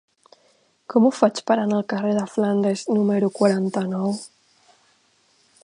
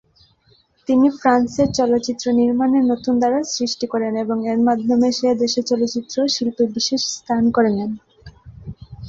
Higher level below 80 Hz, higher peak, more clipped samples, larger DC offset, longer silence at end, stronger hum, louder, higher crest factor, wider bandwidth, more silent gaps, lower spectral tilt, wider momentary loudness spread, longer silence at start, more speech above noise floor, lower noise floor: second, -72 dBFS vs -50 dBFS; about the same, -2 dBFS vs -2 dBFS; neither; neither; first, 1.35 s vs 0 s; neither; second, -21 LUFS vs -18 LUFS; about the same, 20 dB vs 16 dB; first, 10.5 kHz vs 7.8 kHz; neither; first, -6.5 dB/octave vs -4.5 dB/octave; about the same, 6 LU vs 6 LU; about the same, 0.9 s vs 0.9 s; about the same, 41 dB vs 40 dB; first, -62 dBFS vs -57 dBFS